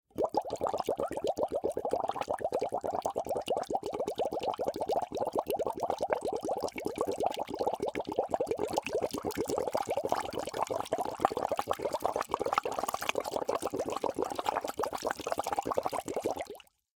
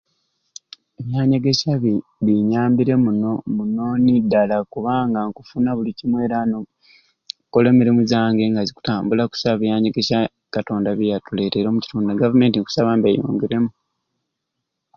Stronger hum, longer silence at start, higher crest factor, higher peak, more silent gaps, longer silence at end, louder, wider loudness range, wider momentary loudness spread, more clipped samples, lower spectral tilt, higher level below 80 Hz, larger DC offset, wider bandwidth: neither; second, 0.15 s vs 1 s; first, 28 dB vs 16 dB; second, -6 dBFS vs -2 dBFS; neither; second, 0.4 s vs 1.25 s; second, -34 LUFS vs -19 LUFS; about the same, 1 LU vs 2 LU; second, 3 LU vs 8 LU; neither; second, -4 dB/octave vs -7 dB/octave; second, -64 dBFS vs -54 dBFS; neither; first, 18 kHz vs 7 kHz